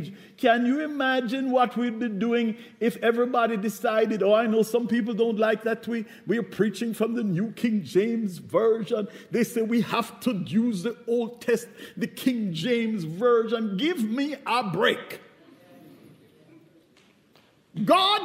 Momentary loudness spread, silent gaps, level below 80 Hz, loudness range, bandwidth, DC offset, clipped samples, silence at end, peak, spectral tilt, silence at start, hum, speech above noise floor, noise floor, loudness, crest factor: 8 LU; none; -74 dBFS; 4 LU; 16 kHz; under 0.1%; under 0.1%; 0 s; -6 dBFS; -5.5 dB/octave; 0 s; none; 35 dB; -60 dBFS; -25 LUFS; 20 dB